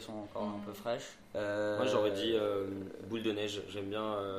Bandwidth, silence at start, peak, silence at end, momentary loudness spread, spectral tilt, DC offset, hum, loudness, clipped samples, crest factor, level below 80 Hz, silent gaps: 15.5 kHz; 0 s; -18 dBFS; 0 s; 10 LU; -5 dB/octave; under 0.1%; none; -36 LUFS; under 0.1%; 18 dB; -68 dBFS; none